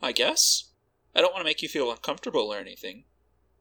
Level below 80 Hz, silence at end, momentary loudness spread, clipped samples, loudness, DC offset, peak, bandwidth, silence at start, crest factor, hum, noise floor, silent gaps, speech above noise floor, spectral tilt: -66 dBFS; 0.6 s; 17 LU; under 0.1%; -25 LUFS; under 0.1%; -4 dBFS; over 20 kHz; 0 s; 24 dB; none; -65 dBFS; none; 39 dB; 0 dB/octave